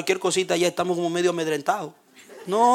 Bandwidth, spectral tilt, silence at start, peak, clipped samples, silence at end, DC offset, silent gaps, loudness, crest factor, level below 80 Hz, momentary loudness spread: 16 kHz; -4 dB/octave; 0 s; -6 dBFS; under 0.1%; 0 s; under 0.1%; none; -24 LUFS; 16 dB; -72 dBFS; 7 LU